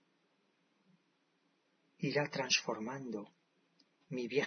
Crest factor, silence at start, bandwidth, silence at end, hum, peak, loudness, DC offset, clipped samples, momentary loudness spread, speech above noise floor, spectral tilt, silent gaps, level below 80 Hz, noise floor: 24 dB; 2 s; 6.4 kHz; 0 s; none; -16 dBFS; -37 LUFS; under 0.1%; under 0.1%; 14 LU; 40 dB; -2.5 dB/octave; none; -88 dBFS; -77 dBFS